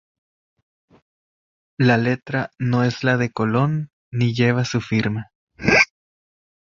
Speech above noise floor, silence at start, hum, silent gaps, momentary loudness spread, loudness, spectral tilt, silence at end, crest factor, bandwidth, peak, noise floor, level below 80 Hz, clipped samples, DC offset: over 70 dB; 1.8 s; none; 3.93-4.12 s, 5.35-5.47 s; 10 LU; -20 LUFS; -6 dB/octave; 0.9 s; 20 dB; 7.4 kHz; -2 dBFS; under -90 dBFS; -52 dBFS; under 0.1%; under 0.1%